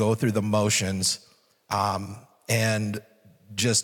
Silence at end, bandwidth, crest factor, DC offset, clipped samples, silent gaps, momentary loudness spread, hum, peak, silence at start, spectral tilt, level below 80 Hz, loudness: 0 s; 18 kHz; 16 dB; under 0.1%; under 0.1%; none; 13 LU; none; -10 dBFS; 0 s; -4 dB/octave; -68 dBFS; -25 LUFS